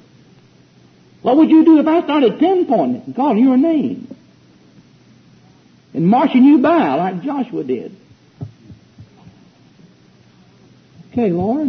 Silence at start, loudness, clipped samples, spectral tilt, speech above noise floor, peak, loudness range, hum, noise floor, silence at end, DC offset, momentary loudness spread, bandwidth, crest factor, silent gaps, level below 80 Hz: 1.25 s; -14 LUFS; under 0.1%; -9 dB/octave; 35 dB; -2 dBFS; 14 LU; none; -49 dBFS; 0 s; under 0.1%; 18 LU; 6 kHz; 14 dB; none; -60 dBFS